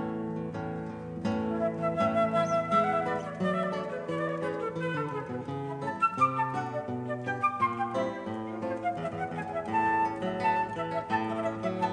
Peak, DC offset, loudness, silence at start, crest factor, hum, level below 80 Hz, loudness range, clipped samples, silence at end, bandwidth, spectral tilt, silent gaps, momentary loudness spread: -14 dBFS; under 0.1%; -31 LUFS; 0 s; 16 dB; none; -62 dBFS; 3 LU; under 0.1%; 0 s; 10 kHz; -7 dB/octave; none; 9 LU